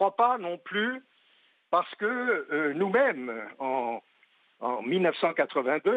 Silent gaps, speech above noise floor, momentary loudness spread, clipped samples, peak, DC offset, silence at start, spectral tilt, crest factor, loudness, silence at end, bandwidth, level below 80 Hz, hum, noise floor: none; 37 dB; 10 LU; under 0.1%; -12 dBFS; under 0.1%; 0 s; -7.5 dB/octave; 16 dB; -28 LUFS; 0 s; 8.4 kHz; -88 dBFS; none; -65 dBFS